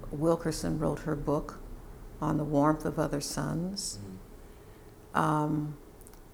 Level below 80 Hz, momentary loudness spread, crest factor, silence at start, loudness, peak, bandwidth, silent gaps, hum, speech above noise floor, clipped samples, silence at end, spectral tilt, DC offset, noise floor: -48 dBFS; 22 LU; 22 dB; 0 s; -31 LUFS; -10 dBFS; over 20 kHz; none; none; 21 dB; under 0.1%; 0 s; -6 dB/octave; under 0.1%; -51 dBFS